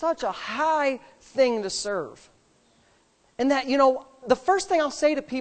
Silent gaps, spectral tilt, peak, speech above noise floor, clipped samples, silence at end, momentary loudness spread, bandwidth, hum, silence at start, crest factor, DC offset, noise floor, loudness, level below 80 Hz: none; -3 dB/octave; -6 dBFS; 38 dB; under 0.1%; 0 s; 12 LU; 9 kHz; none; 0 s; 20 dB; under 0.1%; -63 dBFS; -24 LUFS; -60 dBFS